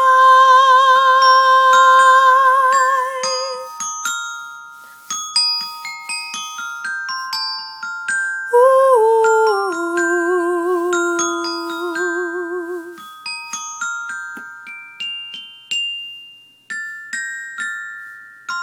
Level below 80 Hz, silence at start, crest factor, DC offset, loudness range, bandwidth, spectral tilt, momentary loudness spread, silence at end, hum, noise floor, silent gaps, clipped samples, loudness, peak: -80 dBFS; 0 s; 16 dB; under 0.1%; 14 LU; 18.5 kHz; 0 dB/octave; 20 LU; 0 s; none; -43 dBFS; none; under 0.1%; -15 LUFS; 0 dBFS